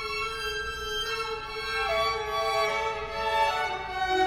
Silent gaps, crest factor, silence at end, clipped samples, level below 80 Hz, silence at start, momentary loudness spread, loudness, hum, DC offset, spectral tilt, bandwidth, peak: none; 16 dB; 0 s; under 0.1%; -48 dBFS; 0 s; 5 LU; -28 LUFS; none; under 0.1%; -2.5 dB/octave; 20 kHz; -14 dBFS